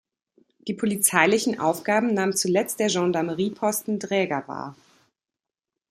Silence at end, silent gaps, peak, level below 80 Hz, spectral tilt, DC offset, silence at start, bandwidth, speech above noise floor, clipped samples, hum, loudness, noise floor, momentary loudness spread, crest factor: 1.2 s; none; -2 dBFS; -70 dBFS; -3.5 dB/octave; under 0.1%; 0.65 s; 16 kHz; 66 dB; under 0.1%; none; -23 LUFS; -89 dBFS; 13 LU; 24 dB